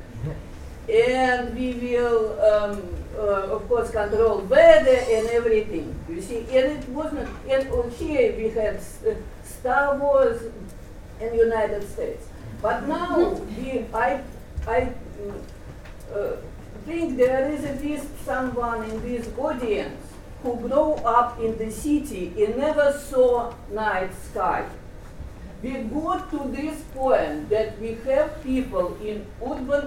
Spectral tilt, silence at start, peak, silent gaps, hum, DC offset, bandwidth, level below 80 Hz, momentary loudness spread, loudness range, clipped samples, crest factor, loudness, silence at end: -6 dB/octave; 0 s; -2 dBFS; none; none; under 0.1%; 16 kHz; -40 dBFS; 16 LU; 8 LU; under 0.1%; 22 dB; -24 LUFS; 0 s